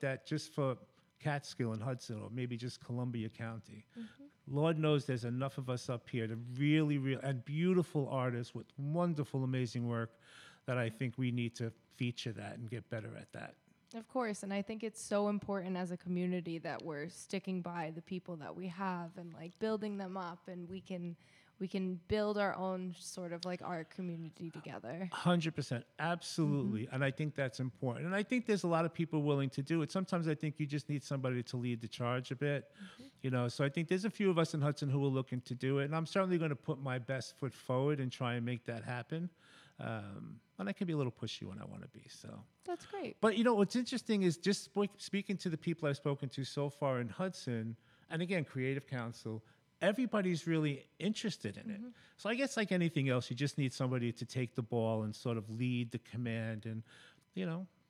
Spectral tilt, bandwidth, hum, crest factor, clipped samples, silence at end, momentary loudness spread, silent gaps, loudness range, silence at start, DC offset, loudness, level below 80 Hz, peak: -6.5 dB/octave; 13.5 kHz; none; 18 dB; under 0.1%; 0.25 s; 13 LU; none; 6 LU; 0 s; under 0.1%; -38 LUFS; -76 dBFS; -18 dBFS